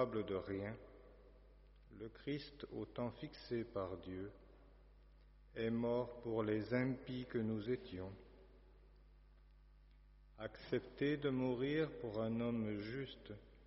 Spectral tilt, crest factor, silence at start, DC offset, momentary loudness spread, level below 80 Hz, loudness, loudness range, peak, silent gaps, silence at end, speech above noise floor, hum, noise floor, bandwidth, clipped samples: -6 dB/octave; 20 dB; 0 s; under 0.1%; 16 LU; -64 dBFS; -43 LUFS; 7 LU; -24 dBFS; none; 0 s; 22 dB; 50 Hz at -65 dBFS; -65 dBFS; 5.8 kHz; under 0.1%